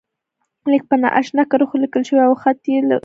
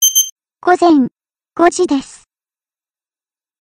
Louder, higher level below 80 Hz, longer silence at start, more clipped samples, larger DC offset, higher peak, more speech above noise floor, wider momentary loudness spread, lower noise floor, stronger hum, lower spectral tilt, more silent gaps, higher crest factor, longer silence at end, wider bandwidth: about the same, -16 LUFS vs -14 LUFS; second, -66 dBFS vs -56 dBFS; first, 0.65 s vs 0 s; neither; neither; about the same, 0 dBFS vs 0 dBFS; second, 58 dB vs over 78 dB; second, 4 LU vs 10 LU; second, -74 dBFS vs under -90 dBFS; neither; first, -6 dB/octave vs -1.5 dB/octave; second, none vs 0.32-0.36 s; about the same, 16 dB vs 16 dB; second, 0.05 s vs 1.6 s; second, 7.4 kHz vs 16 kHz